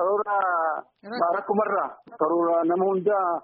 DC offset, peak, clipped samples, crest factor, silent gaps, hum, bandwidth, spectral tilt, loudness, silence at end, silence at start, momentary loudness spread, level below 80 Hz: under 0.1%; -10 dBFS; under 0.1%; 14 dB; none; none; 4.9 kHz; -5.5 dB/octave; -24 LUFS; 0.05 s; 0 s; 6 LU; -76 dBFS